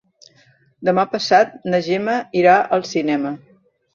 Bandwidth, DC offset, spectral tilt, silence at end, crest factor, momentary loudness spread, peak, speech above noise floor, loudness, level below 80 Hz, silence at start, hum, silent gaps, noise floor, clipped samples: 7.4 kHz; under 0.1%; -5 dB/octave; 0.6 s; 18 dB; 9 LU; -2 dBFS; 38 dB; -18 LUFS; -64 dBFS; 0.8 s; none; none; -55 dBFS; under 0.1%